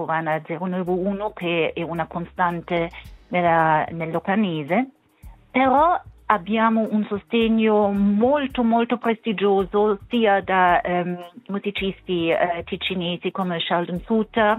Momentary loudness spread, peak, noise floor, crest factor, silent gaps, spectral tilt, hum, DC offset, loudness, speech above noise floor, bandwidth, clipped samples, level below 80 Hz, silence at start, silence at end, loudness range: 9 LU; 0 dBFS; -46 dBFS; 22 dB; none; -8 dB/octave; none; under 0.1%; -22 LUFS; 25 dB; 4.1 kHz; under 0.1%; -50 dBFS; 0 s; 0 s; 4 LU